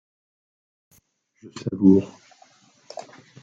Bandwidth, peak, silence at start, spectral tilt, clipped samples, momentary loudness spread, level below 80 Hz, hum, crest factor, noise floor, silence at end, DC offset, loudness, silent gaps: 7.8 kHz; -4 dBFS; 1.55 s; -8.5 dB/octave; under 0.1%; 24 LU; -70 dBFS; none; 22 dB; -62 dBFS; 1.35 s; under 0.1%; -20 LUFS; none